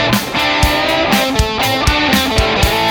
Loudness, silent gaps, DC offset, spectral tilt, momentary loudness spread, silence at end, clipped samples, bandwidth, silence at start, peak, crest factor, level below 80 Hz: -13 LUFS; none; under 0.1%; -4 dB/octave; 2 LU; 0 s; under 0.1%; over 20 kHz; 0 s; 0 dBFS; 14 dB; -22 dBFS